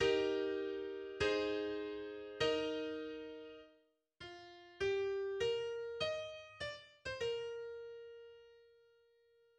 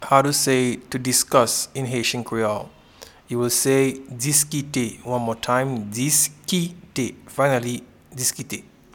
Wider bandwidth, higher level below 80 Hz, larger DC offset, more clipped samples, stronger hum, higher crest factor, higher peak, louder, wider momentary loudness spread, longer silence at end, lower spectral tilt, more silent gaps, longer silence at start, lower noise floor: second, 9.6 kHz vs 19 kHz; second, -68 dBFS vs -58 dBFS; neither; neither; neither; about the same, 20 dB vs 22 dB; second, -22 dBFS vs -2 dBFS; second, -40 LUFS vs -21 LUFS; first, 18 LU vs 12 LU; first, 0.95 s vs 0.35 s; about the same, -4 dB/octave vs -3.5 dB/octave; neither; about the same, 0 s vs 0 s; first, -74 dBFS vs -47 dBFS